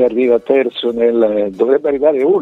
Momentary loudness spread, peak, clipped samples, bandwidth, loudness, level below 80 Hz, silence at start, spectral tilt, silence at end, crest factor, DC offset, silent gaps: 3 LU; 0 dBFS; under 0.1%; 4.3 kHz; -14 LUFS; -52 dBFS; 0 s; -7 dB/octave; 0 s; 14 dB; under 0.1%; none